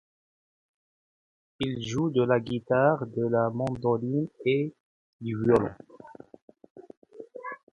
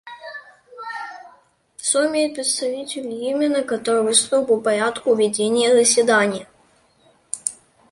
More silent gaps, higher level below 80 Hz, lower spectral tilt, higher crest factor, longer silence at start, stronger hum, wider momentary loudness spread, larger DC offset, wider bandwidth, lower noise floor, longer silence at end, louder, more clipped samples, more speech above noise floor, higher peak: first, 4.80-5.19 s, 6.42-6.48 s, 6.70-6.75 s, 6.97-7.02 s vs none; first, -60 dBFS vs -66 dBFS; first, -7.5 dB/octave vs -2 dB/octave; about the same, 22 dB vs 20 dB; first, 1.6 s vs 0.05 s; neither; about the same, 17 LU vs 17 LU; neither; about the same, 10.5 kHz vs 11.5 kHz; second, -49 dBFS vs -57 dBFS; second, 0.15 s vs 0.35 s; second, -27 LUFS vs -19 LUFS; neither; second, 22 dB vs 39 dB; second, -8 dBFS vs -2 dBFS